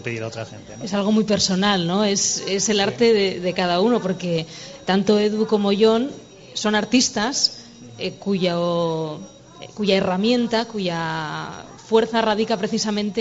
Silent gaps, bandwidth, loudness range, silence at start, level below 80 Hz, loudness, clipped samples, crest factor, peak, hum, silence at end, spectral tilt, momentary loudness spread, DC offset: none; 8 kHz; 3 LU; 0 s; -56 dBFS; -20 LUFS; under 0.1%; 16 dB; -4 dBFS; none; 0 s; -4 dB/octave; 13 LU; under 0.1%